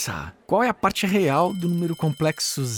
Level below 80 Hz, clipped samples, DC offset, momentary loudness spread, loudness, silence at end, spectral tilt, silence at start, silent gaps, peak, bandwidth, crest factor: -54 dBFS; under 0.1%; under 0.1%; 5 LU; -22 LUFS; 0 s; -5 dB/octave; 0 s; none; -6 dBFS; over 20 kHz; 16 dB